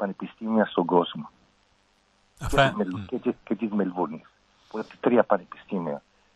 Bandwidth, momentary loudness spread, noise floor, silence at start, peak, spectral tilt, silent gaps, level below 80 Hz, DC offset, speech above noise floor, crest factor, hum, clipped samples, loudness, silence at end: 12 kHz; 16 LU; -65 dBFS; 0 s; -4 dBFS; -6.5 dB/octave; none; -48 dBFS; under 0.1%; 39 dB; 22 dB; none; under 0.1%; -26 LUFS; 0.35 s